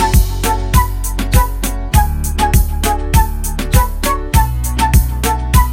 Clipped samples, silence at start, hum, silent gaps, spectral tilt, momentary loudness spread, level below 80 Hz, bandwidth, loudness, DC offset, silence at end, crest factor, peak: under 0.1%; 0 s; none; none; -4.5 dB/octave; 5 LU; -14 dBFS; 17 kHz; -15 LUFS; under 0.1%; 0 s; 12 dB; 0 dBFS